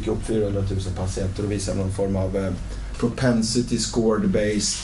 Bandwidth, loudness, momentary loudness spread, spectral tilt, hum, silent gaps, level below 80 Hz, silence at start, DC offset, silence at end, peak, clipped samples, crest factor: 11.5 kHz; -24 LUFS; 6 LU; -5 dB/octave; none; none; -34 dBFS; 0 s; under 0.1%; 0 s; -8 dBFS; under 0.1%; 14 dB